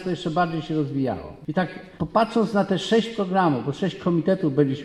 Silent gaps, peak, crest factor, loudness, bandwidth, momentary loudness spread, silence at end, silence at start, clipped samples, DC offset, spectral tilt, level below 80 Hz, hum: none; -6 dBFS; 16 dB; -24 LUFS; 11.5 kHz; 7 LU; 0 s; 0 s; under 0.1%; under 0.1%; -7 dB/octave; -54 dBFS; none